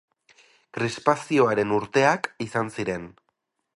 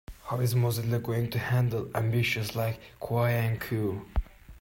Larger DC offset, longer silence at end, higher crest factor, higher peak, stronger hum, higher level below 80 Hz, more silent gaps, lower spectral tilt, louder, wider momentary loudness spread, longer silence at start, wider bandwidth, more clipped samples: neither; first, 0.65 s vs 0.05 s; first, 22 dB vs 14 dB; first, -2 dBFS vs -14 dBFS; neither; second, -62 dBFS vs -42 dBFS; neither; about the same, -5.5 dB/octave vs -6 dB/octave; first, -24 LUFS vs -29 LUFS; about the same, 11 LU vs 9 LU; first, 0.75 s vs 0.1 s; second, 11.5 kHz vs 16.5 kHz; neither